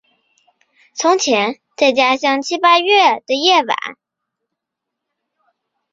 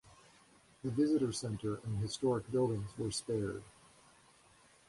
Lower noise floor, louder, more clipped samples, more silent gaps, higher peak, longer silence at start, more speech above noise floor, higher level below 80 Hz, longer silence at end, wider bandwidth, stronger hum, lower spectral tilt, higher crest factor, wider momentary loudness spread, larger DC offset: first, -80 dBFS vs -65 dBFS; first, -14 LUFS vs -36 LUFS; neither; neither; first, -2 dBFS vs -22 dBFS; first, 0.95 s vs 0.1 s; first, 66 dB vs 30 dB; second, -68 dBFS vs -62 dBFS; first, 2 s vs 1.2 s; second, 7.8 kHz vs 11.5 kHz; neither; second, -1.5 dB/octave vs -6 dB/octave; about the same, 16 dB vs 16 dB; about the same, 10 LU vs 8 LU; neither